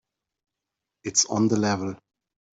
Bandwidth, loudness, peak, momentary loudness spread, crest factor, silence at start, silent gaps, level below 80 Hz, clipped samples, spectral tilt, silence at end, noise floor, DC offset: 8.2 kHz; -23 LUFS; -8 dBFS; 16 LU; 20 dB; 1.05 s; none; -68 dBFS; under 0.1%; -3.5 dB/octave; 0.6 s; -86 dBFS; under 0.1%